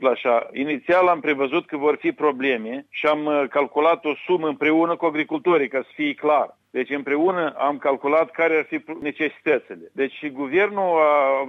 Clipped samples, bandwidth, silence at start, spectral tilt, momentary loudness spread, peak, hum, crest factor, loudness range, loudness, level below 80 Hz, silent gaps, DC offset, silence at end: under 0.1%; 6.2 kHz; 0 s; -7 dB/octave; 8 LU; -6 dBFS; none; 16 dB; 2 LU; -21 LUFS; -70 dBFS; none; under 0.1%; 0 s